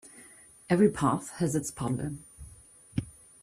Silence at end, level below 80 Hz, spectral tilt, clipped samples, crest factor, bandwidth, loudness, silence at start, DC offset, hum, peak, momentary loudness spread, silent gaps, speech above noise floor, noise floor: 0.3 s; -56 dBFS; -6.5 dB/octave; under 0.1%; 20 dB; 15 kHz; -29 LUFS; 0.05 s; under 0.1%; none; -10 dBFS; 25 LU; none; 26 dB; -54 dBFS